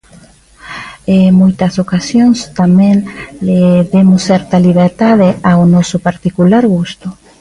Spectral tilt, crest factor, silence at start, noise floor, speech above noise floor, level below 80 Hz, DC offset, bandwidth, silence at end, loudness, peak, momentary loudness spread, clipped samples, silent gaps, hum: -7.5 dB/octave; 10 dB; 0.65 s; -40 dBFS; 32 dB; -42 dBFS; under 0.1%; 11 kHz; 0.25 s; -9 LUFS; 0 dBFS; 13 LU; under 0.1%; none; none